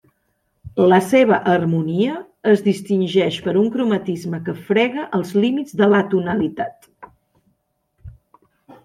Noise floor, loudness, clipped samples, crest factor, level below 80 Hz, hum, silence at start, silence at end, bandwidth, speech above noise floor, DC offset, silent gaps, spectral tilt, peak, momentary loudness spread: -68 dBFS; -18 LUFS; under 0.1%; 18 dB; -56 dBFS; none; 0.65 s; 0.1 s; 15 kHz; 51 dB; under 0.1%; none; -7 dB/octave; -2 dBFS; 10 LU